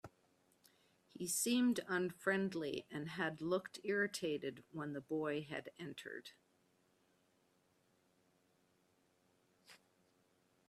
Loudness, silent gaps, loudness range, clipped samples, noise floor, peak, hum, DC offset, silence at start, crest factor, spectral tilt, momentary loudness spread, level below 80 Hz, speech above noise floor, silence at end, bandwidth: -41 LUFS; none; 15 LU; under 0.1%; -77 dBFS; -24 dBFS; none; under 0.1%; 0.05 s; 20 dB; -4 dB/octave; 14 LU; -84 dBFS; 36 dB; 0.95 s; 15 kHz